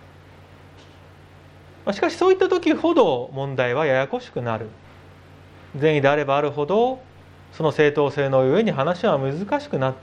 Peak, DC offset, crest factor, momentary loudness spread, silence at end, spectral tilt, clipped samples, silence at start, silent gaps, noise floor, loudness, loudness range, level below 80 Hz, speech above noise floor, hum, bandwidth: -2 dBFS; under 0.1%; 20 dB; 10 LU; 0 s; -7 dB/octave; under 0.1%; 0.5 s; none; -47 dBFS; -21 LUFS; 3 LU; -62 dBFS; 26 dB; none; 10 kHz